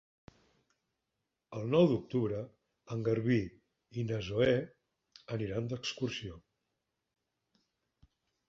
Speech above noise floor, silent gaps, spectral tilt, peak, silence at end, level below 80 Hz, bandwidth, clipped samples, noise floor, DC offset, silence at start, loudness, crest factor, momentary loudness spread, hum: 54 dB; none; -7 dB/octave; -14 dBFS; 2.1 s; -64 dBFS; 7.8 kHz; under 0.1%; -86 dBFS; under 0.1%; 1.5 s; -34 LUFS; 22 dB; 17 LU; none